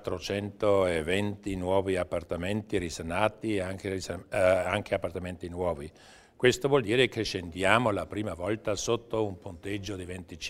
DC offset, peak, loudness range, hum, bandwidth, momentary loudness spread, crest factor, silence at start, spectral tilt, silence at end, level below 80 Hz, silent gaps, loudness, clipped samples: under 0.1%; -4 dBFS; 3 LU; none; 16 kHz; 11 LU; 24 dB; 0 s; -5 dB/octave; 0 s; -52 dBFS; none; -29 LUFS; under 0.1%